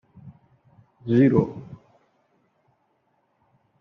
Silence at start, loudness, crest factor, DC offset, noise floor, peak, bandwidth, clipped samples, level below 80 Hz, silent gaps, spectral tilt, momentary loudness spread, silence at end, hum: 0.25 s; -21 LUFS; 22 dB; under 0.1%; -69 dBFS; -6 dBFS; 6 kHz; under 0.1%; -62 dBFS; none; -9 dB/octave; 24 LU; 2.05 s; none